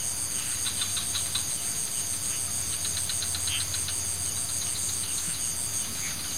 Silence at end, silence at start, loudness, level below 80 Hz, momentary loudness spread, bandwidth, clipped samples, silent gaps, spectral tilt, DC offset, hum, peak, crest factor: 0 s; 0 s; -27 LUFS; -52 dBFS; 1 LU; 16 kHz; under 0.1%; none; -0.5 dB/octave; 0.8%; none; -14 dBFS; 16 dB